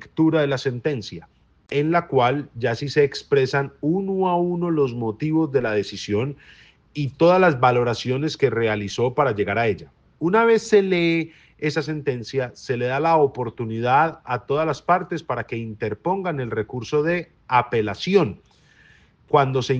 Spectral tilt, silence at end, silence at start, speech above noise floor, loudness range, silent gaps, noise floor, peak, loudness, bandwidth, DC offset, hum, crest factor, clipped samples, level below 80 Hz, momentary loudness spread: -6.5 dB/octave; 0 s; 0 s; 33 dB; 3 LU; none; -54 dBFS; -4 dBFS; -22 LUFS; 8 kHz; under 0.1%; none; 18 dB; under 0.1%; -58 dBFS; 10 LU